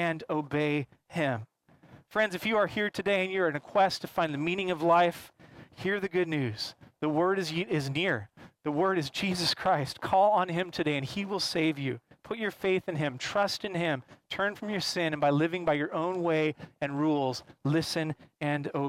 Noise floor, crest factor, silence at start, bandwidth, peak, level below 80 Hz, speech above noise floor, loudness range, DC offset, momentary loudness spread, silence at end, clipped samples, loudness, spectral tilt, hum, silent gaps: -57 dBFS; 16 dB; 0 s; 16 kHz; -14 dBFS; -66 dBFS; 27 dB; 3 LU; under 0.1%; 8 LU; 0 s; under 0.1%; -30 LUFS; -5.5 dB/octave; none; none